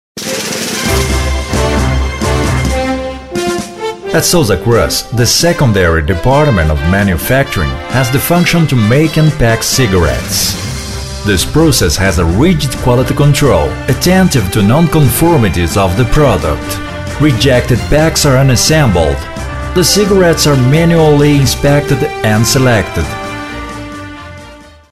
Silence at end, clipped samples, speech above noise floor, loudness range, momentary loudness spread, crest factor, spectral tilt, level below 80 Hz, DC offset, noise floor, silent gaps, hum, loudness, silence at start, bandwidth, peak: 0.2 s; under 0.1%; 25 dB; 4 LU; 11 LU; 10 dB; -5 dB/octave; -22 dBFS; 1%; -34 dBFS; none; none; -10 LUFS; 0.15 s; 15.5 kHz; 0 dBFS